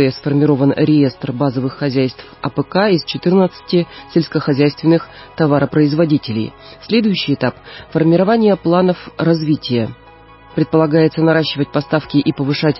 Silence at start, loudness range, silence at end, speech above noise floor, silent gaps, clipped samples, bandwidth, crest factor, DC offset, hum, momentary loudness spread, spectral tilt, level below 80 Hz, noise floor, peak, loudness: 0 s; 1 LU; 0 s; 26 dB; none; under 0.1%; 5.8 kHz; 14 dB; under 0.1%; none; 8 LU; -11 dB/octave; -50 dBFS; -41 dBFS; -2 dBFS; -15 LUFS